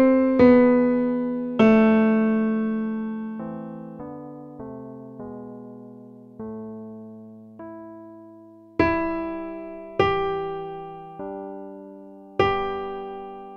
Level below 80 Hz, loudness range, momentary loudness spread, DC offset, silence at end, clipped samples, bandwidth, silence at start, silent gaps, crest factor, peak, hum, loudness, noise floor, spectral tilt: -50 dBFS; 19 LU; 24 LU; under 0.1%; 0 s; under 0.1%; 6.2 kHz; 0 s; none; 20 dB; -4 dBFS; none; -22 LUFS; -47 dBFS; -8.5 dB/octave